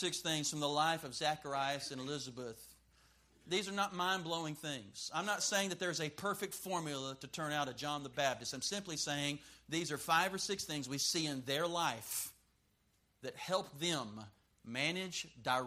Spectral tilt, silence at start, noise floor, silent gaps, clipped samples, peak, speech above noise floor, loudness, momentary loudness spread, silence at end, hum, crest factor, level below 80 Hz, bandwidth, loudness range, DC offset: -2.5 dB/octave; 0 s; -76 dBFS; none; under 0.1%; -18 dBFS; 37 dB; -38 LUFS; 10 LU; 0 s; none; 22 dB; -74 dBFS; 15.5 kHz; 4 LU; under 0.1%